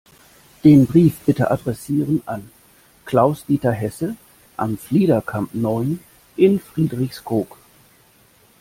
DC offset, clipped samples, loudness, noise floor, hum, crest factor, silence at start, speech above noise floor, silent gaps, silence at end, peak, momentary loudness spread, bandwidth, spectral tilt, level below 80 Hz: under 0.1%; under 0.1%; -19 LUFS; -54 dBFS; none; 18 dB; 0.65 s; 36 dB; none; 1.15 s; -2 dBFS; 15 LU; 16.5 kHz; -8 dB/octave; -52 dBFS